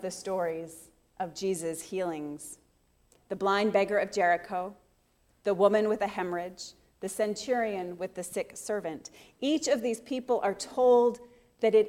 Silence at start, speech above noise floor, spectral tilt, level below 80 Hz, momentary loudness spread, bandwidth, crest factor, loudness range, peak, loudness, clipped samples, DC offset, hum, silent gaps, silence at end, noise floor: 0 s; 39 dB; -4 dB/octave; -68 dBFS; 17 LU; 16 kHz; 20 dB; 6 LU; -10 dBFS; -30 LUFS; under 0.1%; under 0.1%; none; none; 0 s; -68 dBFS